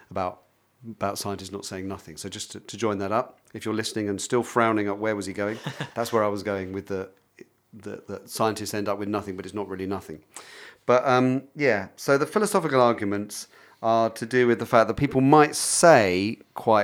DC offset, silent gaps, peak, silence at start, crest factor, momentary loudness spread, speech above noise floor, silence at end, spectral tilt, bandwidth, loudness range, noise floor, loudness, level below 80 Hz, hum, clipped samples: under 0.1%; none; -2 dBFS; 0.1 s; 22 dB; 18 LU; 29 dB; 0 s; -4.5 dB/octave; 17.5 kHz; 10 LU; -53 dBFS; -24 LUFS; -60 dBFS; none; under 0.1%